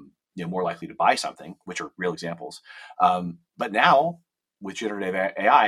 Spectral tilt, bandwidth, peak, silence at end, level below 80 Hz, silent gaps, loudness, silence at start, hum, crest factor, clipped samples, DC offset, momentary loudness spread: -4.5 dB/octave; 13.5 kHz; -2 dBFS; 0 s; -72 dBFS; none; -24 LUFS; 0 s; none; 22 dB; under 0.1%; under 0.1%; 21 LU